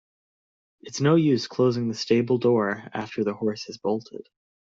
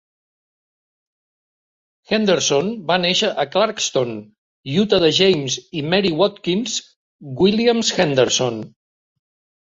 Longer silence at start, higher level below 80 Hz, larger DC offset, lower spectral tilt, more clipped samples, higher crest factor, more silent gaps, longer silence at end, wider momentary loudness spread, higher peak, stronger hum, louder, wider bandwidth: second, 0.85 s vs 2.1 s; second, -66 dBFS vs -56 dBFS; neither; first, -6.5 dB/octave vs -4 dB/octave; neither; about the same, 16 dB vs 18 dB; second, none vs 4.38-4.63 s, 6.96-7.19 s; second, 0.5 s vs 0.95 s; about the same, 11 LU vs 10 LU; second, -8 dBFS vs -2 dBFS; neither; second, -24 LUFS vs -18 LUFS; about the same, 7.8 kHz vs 7.8 kHz